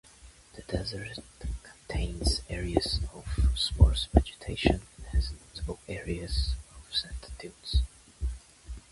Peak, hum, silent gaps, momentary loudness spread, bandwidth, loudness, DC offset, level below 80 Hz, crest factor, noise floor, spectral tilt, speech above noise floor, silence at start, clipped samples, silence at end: -4 dBFS; none; none; 15 LU; 11.5 kHz; -31 LUFS; under 0.1%; -32 dBFS; 26 dB; -54 dBFS; -5 dB/octave; 25 dB; 0.25 s; under 0.1%; 0.1 s